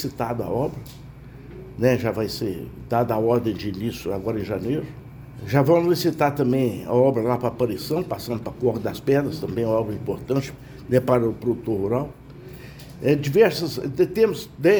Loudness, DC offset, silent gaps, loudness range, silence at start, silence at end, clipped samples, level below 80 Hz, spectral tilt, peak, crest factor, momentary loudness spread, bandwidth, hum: -23 LUFS; under 0.1%; none; 4 LU; 0 s; 0 s; under 0.1%; -48 dBFS; -7 dB/octave; -4 dBFS; 18 dB; 21 LU; over 20 kHz; none